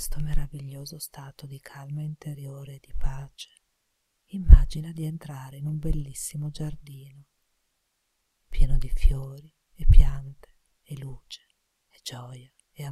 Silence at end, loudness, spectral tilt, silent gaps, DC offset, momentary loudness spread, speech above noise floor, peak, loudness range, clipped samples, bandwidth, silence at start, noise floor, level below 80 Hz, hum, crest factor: 0 s; -29 LUFS; -6 dB/octave; none; under 0.1%; 23 LU; 53 dB; 0 dBFS; 11 LU; under 0.1%; 13.5 kHz; 0 s; -76 dBFS; -26 dBFS; none; 24 dB